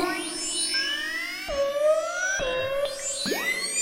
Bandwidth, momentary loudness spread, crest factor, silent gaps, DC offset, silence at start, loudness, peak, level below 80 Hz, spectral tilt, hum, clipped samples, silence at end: 16 kHz; 5 LU; 14 dB; none; under 0.1%; 0 s; -26 LUFS; -12 dBFS; -50 dBFS; -1 dB/octave; none; under 0.1%; 0 s